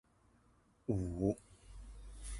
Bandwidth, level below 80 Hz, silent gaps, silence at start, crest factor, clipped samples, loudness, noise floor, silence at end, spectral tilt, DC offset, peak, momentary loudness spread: 11.5 kHz; -52 dBFS; none; 0.9 s; 22 dB; under 0.1%; -40 LUFS; -70 dBFS; 0 s; -7.5 dB/octave; under 0.1%; -20 dBFS; 20 LU